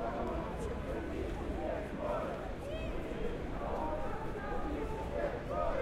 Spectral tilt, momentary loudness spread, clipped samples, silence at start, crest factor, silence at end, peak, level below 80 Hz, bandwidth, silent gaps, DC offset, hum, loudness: -7 dB/octave; 3 LU; under 0.1%; 0 s; 16 dB; 0 s; -22 dBFS; -44 dBFS; 14.5 kHz; none; under 0.1%; none; -39 LUFS